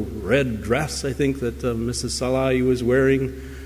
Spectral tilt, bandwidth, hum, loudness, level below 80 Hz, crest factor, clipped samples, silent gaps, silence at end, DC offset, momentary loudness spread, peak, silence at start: -5.5 dB/octave; 16 kHz; none; -22 LUFS; -36 dBFS; 16 dB; under 0.1%; none; 0 s; under 0.1%; 7 LU; -6 dBFS; 0 s